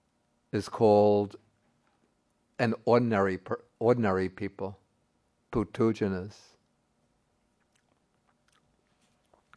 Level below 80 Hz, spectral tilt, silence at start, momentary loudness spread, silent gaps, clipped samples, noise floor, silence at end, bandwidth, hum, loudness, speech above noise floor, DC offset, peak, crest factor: -62 dBFS; -7.5 dB/octave; 0.55 s; 15 LU; none; under 0.1%; -73 dBFS; 3.25 s; 11 kHz; none; -28 LUFS; 46 dB; under 0.1%; -10 dBFS; 20 dB